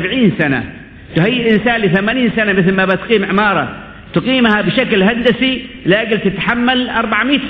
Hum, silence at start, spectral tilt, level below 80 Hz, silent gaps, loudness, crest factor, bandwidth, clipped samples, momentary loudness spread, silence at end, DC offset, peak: none; 0 s; -8.5 dB/octave; -40 dBFS; none; -13 LUFS; 14 dB; 5.2 kHz; under 0.1%; 7 LU; 0 s; under 0.1%; 0 dBFS